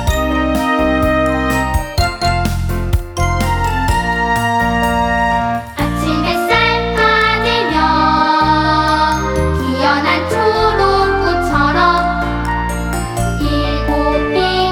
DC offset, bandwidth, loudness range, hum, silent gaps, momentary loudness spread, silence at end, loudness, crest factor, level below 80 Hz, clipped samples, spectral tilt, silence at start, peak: under 0.1%; over 20 kHz; 3 LU; none; none; 6 LU; 0 s; -14 LUFS; 12 dB; -24 dBFS; under 0.1%; -5.5 dB/octave; 0 s; -2 dBFS